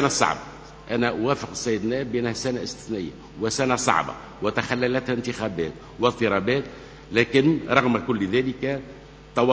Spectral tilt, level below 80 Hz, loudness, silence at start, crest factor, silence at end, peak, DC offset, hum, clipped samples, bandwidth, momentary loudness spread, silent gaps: -4.5 dB/octave; -50 dBFS; -24 LUFS; 0 s; 24 dB; 0 s; 0 dBFS; under 0.1%; none; under 0.1%; 8 kHz; 11 LU; none